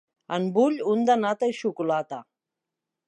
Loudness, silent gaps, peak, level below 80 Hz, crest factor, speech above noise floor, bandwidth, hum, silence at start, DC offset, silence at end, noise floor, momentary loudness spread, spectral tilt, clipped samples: -25 LUFS; none; -10 dBFS; -80 dBFS; 16 dB; 62 dB; 9.2 kHz; none; 0.3 s; under 0.1%; 0.85 s; -86 dBFS; 10 LU; -6 dB/octave; under 0.1%